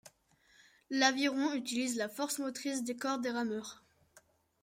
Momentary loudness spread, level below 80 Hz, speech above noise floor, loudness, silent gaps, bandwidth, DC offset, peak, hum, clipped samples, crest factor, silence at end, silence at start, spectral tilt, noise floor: 9 LU; -82 dBFS; 34 dB; -34 LUFS; none; 16 kHz; under 0.1%; -14 dBFS; none; under 0.1%; 22 dB; 0.45 s; 0.05 s; -2 dB/octave; -69 dBFS